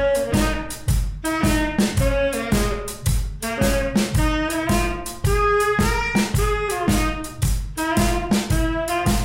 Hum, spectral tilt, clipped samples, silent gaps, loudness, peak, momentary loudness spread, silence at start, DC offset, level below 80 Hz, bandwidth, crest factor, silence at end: none; -5 dB/octave; under 0.1%; none; -21 LUFS; -6 dBFS; 6 LU; 0 s; 0.2%; -26 dBFS; 16.5 kHz; 14 dB; 0 s